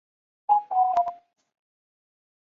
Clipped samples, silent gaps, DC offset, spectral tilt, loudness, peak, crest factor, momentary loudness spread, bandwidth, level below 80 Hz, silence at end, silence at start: under 0.1%; none; under 0.1%; -4 dB/octave; -24 LUFS; -10 dBFS; 18 dB; 10 LU; 6.8 kHz; -78 dBFS; 1.3 s; 0.5 s